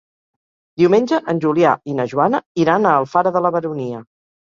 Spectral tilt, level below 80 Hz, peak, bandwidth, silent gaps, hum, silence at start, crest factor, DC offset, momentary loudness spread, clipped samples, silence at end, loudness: -7 dB/octave; -62 dBFS; 0 dBFS; 7.4 kHz; 2.46-2.55 s; none; 0.8 s; 16 dB; under 0.1%; 11 LU; under 0.1%; 0.55 s; -17 LUFS